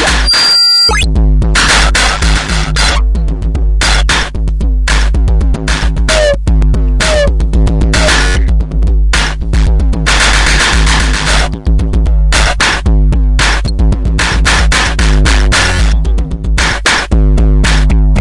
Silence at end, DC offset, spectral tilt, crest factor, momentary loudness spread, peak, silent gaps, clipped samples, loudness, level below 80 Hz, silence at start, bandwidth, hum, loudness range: 0 s; under 0.1%; -3.5 dB/octave; 8 dB; 6 LU; 0 dBFS; none; under 0.1%; -10 LUFS; -10 dBFS; 0 s; 11.5 kHz; none; 2 LU